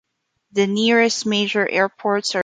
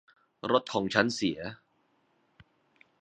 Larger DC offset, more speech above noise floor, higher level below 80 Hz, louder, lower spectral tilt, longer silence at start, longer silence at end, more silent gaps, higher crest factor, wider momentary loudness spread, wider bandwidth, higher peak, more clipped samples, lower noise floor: neither; first, 48 dB vs 42 dB; about the same, -68 dBFS vs -66 dBFS; first, -19 LUFS vs -29 LUFS; about the same, -3.5 dB/octave vs -4.5 dB/octave; about the same, 0.55 s vs 0.45 s; second, 0 s vs 1.45 s; neither; second, 16 dB vs 28 dB; second, 6 LU vs 13 LU; about the same, 9.4 kHz vs 9.4 kHz; about the same, -4 dBFS vs -4 dBFS; neither; second, -66 dBFS vs -71 dBFS